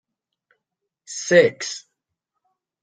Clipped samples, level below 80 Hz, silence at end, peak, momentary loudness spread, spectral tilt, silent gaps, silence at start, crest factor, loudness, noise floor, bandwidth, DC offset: under 0.1%; -70 dBFS; 1.05 s; -2 dBFS; 18 LU; -3.5 dB/octave; none; 1.1 s; 22 dB; -19 LUFS; -81 dBFS; 9.4 kHz; under 0.1%